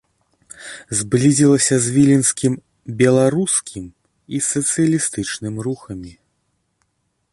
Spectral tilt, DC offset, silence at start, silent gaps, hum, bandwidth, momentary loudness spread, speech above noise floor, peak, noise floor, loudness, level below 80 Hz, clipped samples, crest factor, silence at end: -5 dB/octave; under 0.1%; 0.6 s; none; none; 11.5 kHz; 20 LU; 52 dB; -2 dBFS; -69 dBFS; -17 LUFS; -52 dBFS; under 0.1%; 16 dB; 1.2 s